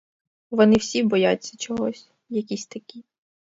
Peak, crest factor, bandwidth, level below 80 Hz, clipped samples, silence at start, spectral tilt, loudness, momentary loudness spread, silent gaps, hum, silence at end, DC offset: -4 dBFS; 20 dB; 7.8 kHz; -60 dBFS; under 0.1%; 0.5 s; -5 dB/octave; -23 LUFS; 17 LU; none; none; 0.6 s; under 0.1%